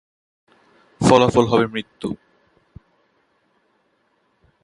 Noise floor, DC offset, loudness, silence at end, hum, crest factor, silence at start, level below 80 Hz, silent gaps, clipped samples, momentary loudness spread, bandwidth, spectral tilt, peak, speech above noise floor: -65 dBFS; under 0.1%; -18 LUFS; 2.5 s; none; 22 dB; 1 s; -48 dBFS; none; under 0.1%; 16 LU; 11.5 kHz; -6 dB/octave; 0 dBFS; 48 dB